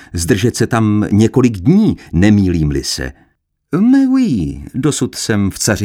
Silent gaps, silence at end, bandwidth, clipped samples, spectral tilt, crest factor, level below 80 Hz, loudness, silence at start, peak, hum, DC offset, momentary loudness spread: none; 0 s; 16.5 kHz; under 0.1%; -5.5 dB/octave; 12 dB; -34 dBFS; -14 LUFS; 0.15 s; 0 dBFS; none; under 0.1%; 8 LU